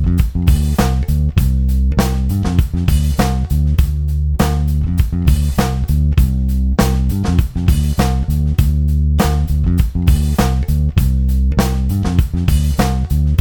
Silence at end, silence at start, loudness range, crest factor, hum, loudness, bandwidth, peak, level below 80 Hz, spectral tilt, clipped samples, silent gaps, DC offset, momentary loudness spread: 0 s; 0 s; 1 LU; 12 dB; none; -16 LUFS; 19 kHz; 0 dBFS; -16 dBFS; -6.5 dB/octave; under 0.1%; none; under 0.1%; 2 LU